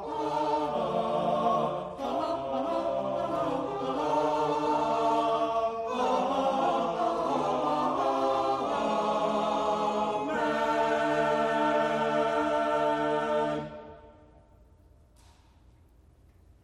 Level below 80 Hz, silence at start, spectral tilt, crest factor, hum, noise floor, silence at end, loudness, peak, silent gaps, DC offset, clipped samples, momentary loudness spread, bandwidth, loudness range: -60 dBFS; 0 s; -5.5 dB/octave; 14 dB; none; -59 dBFS; 2.55 s; -28 LUFS; -16 dBFS; none; under 0.1%; under 0.1%; 5 LU; 12.5 kHz; 4 LU